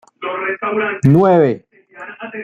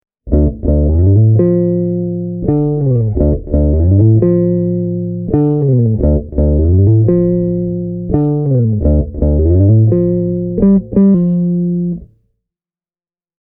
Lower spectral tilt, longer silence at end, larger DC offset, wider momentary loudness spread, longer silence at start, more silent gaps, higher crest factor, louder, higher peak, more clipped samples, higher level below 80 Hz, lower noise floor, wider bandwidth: second, -8.5 dB/octave vs -16 dB/octave; second, 0 s vs 1.35 s; neither; first, 20 LU vs 8 LU; about the same, 0.2 s vs 0.25 s; neither; about the same, 14 dB vs 12 dB; about the same, -15 LUFS vs -13 LUFS; about the same, -2 dBFS vs 0 dBFS; neither; second, -54 dBFS vs -20 dBFS; second, -36 dBFS vs under -90 dBFS; first, 8.2 kHz vs 2.1 kHz